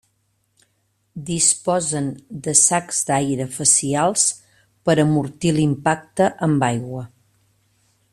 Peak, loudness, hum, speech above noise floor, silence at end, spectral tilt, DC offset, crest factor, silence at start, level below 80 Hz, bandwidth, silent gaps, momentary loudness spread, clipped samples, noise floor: 0 dBFS; -18 LUFS; none; 48 dB; 1.05 s; -4 dB/octave; under 0.1%; 20 dB; 1.15 s; -56 dBFS; 13.5 kHz; none; 15 LU; under 0.1%; -67 dBFS